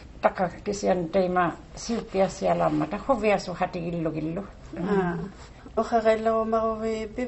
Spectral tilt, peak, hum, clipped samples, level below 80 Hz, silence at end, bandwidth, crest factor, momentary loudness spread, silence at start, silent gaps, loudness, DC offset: -6 dB/octave; -6 dBFS; none; under 0.1%; -48 dBFS; 0 s; 8.2 kHz; 20 dB; 10 LU; 0 s; none; -26 LUFS; under 0.1%